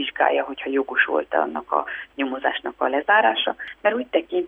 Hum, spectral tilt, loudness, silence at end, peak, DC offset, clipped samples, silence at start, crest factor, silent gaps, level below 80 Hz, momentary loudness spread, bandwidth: none; -5.5 dB/octave; -22 LUFS; 0 s; -4 dBFS; under 0.1%; under 0.1%; 0 s; 18 dB; none; -62 dBFS; 8 LU; 3.9 kHz